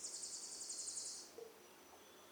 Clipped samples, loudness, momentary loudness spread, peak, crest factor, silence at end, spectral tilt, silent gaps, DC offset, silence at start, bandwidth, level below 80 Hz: under 0.1%; -47 LUFS; 16 LU; -34 dBFS; 18 dB; 0 s; 1 dB/octave; none; under 0.1%; 0 s; over 20 kHz; -90 dBFS